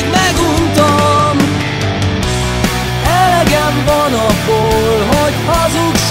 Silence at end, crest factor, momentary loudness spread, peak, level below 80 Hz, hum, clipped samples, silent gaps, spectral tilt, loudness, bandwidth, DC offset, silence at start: 0 s; 10 dB; 5 LU; 0 dBFS; -26 dBFS; none; under 0.1%; none; -4.5 dB/octave; -12 LUFS; 16.5 kHz; under 0.1%; 0 s